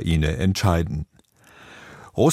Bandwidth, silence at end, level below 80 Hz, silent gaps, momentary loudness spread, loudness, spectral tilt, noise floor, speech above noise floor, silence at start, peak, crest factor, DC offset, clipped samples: 15.5 kHz; 0 s; -34 dBFS; none; 22 LU; -23 LUFS; -6 dB/octave; -54 dBFS; 33 dB; 0 s; -4 dBFS; 20 dB; under 0.1%; under 0.1%